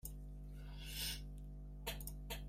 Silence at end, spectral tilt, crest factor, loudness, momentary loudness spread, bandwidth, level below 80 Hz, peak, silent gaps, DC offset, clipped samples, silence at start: 0 s; -3 dB/octave; 18 dB; -48 LUFS; 10 LU; 16 kHz; -50 dBFS; -30 dBFS; none; under 0.1%; under 0.1%; 0.05 s